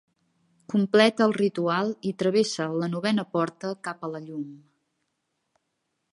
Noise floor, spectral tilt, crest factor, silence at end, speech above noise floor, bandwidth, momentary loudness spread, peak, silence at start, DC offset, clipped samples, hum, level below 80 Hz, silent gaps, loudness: -78 dBFS; -5.5 dB/octave; 22 dB; 1.55 s; 53 dB; 11.5 kHz; 15 LU; -6 dBFS; 0.7 s; under 0.1%; under 0.1%; none; -76 dBFS; none; -25 LUFS